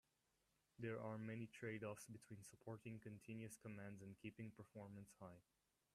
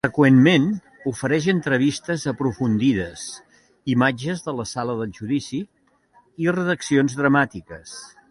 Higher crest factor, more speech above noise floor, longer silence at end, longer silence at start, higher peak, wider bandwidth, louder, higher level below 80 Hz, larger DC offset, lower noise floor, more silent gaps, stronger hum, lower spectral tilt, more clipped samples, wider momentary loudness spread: about the same, 18 dB vs 18 dB; second, 32 dB vs 38 dB; first, 0.55 s vs 0.25 s; first, 0.8 s vs 0.05 s; second, -38 dBFS vs -2 dBFS; first, 13.5 kHz vs 11.5 kHz; second, -56 LUFS vs -21 LUFS; second, -86 dBFS vs -54 dBFS; neither; first, -87 dBFS vs -58 dBFS; neither; neither; about the same, -6 dB/octave vs -6 dB/octave; neither; second, 9 LU vs 18 LU